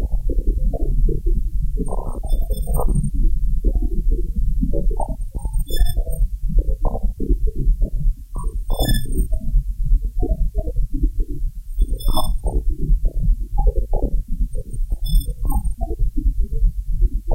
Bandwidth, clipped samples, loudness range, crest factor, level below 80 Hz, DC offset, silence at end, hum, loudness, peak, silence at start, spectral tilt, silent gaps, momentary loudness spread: 15 kHz; under 0.1%; 1 LU; 14 dB; -18 dBFS; under 0.1%; 0 s; none; -25 LUFS; -4 dBFS; 0 s; -6.5 dB/octave; none; 5 LU